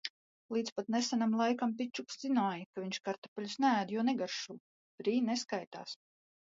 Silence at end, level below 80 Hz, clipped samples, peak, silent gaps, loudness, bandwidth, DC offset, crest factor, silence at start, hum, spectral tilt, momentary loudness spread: 0.55 s; -86 dBFS; under 0.1%; -18 dBFS; 0.10-0.49 s, 0.72-0.76 s, 2.66-2.73 s, 3.18-3.22 s, 3.28-3.36 s, 4.60-4.98 s, 5.67-5.71 s; -35 LUFS; 7.8 kHz; under 0.1%; 18 dB; 0.05 s; none; -4 dB/octave; 14 LU